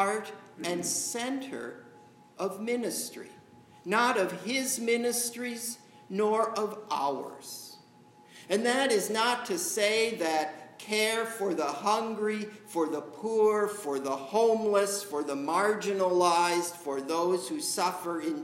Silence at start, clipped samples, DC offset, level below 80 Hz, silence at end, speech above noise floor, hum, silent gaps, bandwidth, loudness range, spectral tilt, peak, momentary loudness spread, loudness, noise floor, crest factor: 0 s; under 0.1%; under 0.1%; -84 dBFS; 0 s; 27 dB; none; none; 16 kHz; 5 LU; -2.5 dB/octave; -10 dBFS; 12 LU; -29 LUFS; -57 dBFS; 20 dB